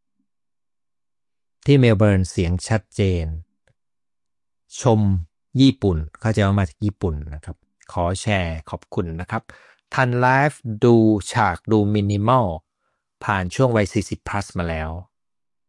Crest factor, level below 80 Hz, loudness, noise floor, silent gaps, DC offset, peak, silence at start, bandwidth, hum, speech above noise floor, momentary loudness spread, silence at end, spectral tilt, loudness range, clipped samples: 18 dB; -42 dBFS; -20 LUFS; under -90 dBFS; none; under 0.1%; -4 dBFS; 1.65 s; 11.5 kHz; none; over 71 dB; 14 LU; 0.65 s; -6.5 dB/octave; 5 LU; under 0.1%